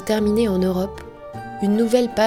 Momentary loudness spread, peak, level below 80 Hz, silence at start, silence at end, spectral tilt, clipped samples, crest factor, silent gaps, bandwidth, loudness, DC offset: 17 LU; -4 dBFS; -42 dBFS; 0 s; 0 s; -6.5 dB/octave; under 0.1%; 16 dB; none; 16.5 kHz; -20 LUFS; under 0.1%